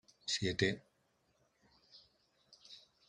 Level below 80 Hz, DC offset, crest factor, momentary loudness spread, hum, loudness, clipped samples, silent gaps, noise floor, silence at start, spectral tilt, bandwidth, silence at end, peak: -72 dBFS; under 0.1%; 26 dB; 22 LU; none; -37 LUFS; under 0.1%; none; -77 dBFS; 0.25 s; -3.5 dB/octave; 11.5 kHz; 0.3 s; -18 dBFS